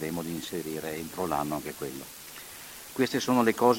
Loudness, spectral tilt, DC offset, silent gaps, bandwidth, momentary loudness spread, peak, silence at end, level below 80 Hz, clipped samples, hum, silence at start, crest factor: -30 LUFS; -4.5 dB/octave; under 0.1%; none; 17 kHz; 17 LU; -8 dBFS; 0 s; -60 dBFS; under 0.1%; none; 0 s; 22 dB